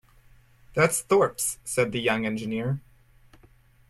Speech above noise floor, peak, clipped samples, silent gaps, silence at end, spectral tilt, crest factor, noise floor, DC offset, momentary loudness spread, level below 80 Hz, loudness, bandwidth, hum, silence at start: 32 dB; -6 dBFS; under 0.1%; none; 1.1 s; -4 dB/octave; 22 dB; -57 dBFS; under 0.1%; 9 LU; -58 dBFS; -25 LUFS; 15.5 kHz; none; 0.7 s